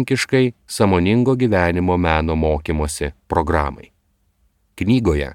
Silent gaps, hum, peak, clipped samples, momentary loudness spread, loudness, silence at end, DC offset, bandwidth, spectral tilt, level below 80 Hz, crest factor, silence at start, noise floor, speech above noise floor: none; none; 0 dBFS; under 0.1%; 6 LU; -18 LUFS; 0 s; under 0.1%; 15.5 kHz; -6 dB/octave; -32 dBFS; 18 dB; 0 s; -63 dBFS; 46 dB